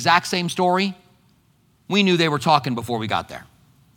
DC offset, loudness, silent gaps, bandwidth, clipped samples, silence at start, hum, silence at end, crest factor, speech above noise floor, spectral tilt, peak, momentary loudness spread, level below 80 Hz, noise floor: under 0.1%; -20 LUFS; none; 18.5 kHz; under 0.1%; 0 s; none; 0.55 s; 22 dB; 40 dB; -4.5 dB/octave; 0 dBFS; 9 LU; -62 dBFS; -60 dBFS